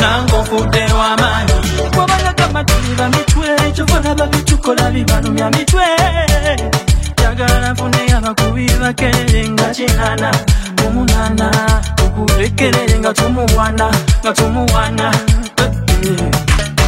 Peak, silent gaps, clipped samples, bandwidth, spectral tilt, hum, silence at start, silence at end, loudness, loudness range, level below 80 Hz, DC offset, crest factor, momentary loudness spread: 0 dBFS; none; under 0.1%; 16.5 kHz; -4.5 dB/octave; none; 0 s; 0 s; -13 LUFS; 1 LU; -18 dBFS; under 0.1%; 12 dB; 2 LU